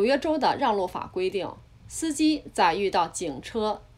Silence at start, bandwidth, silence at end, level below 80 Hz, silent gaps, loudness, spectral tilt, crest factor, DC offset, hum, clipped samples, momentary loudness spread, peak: 0 s; 15 kHz; 0.15 s; -54 dBFS; none; -26 LUFS; -3.5 dB/octave; 16 dB; under 0.1%; none; under 0.1%; 9 LU; -8 dBFS